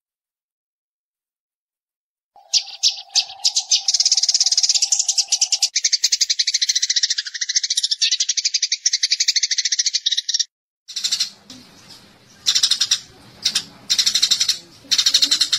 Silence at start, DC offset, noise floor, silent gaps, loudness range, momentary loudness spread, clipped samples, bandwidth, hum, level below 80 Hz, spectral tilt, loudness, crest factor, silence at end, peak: 2.55 s; under 0.1%; under -90 dBFS; 10.51-10.86 s; 5 LU; 7 LU; under 0.1%; 16 kHz; none; -68 dBFS; 4 dB/octave; -17 LUFS; 18 dB; 0 s; -2 dBFS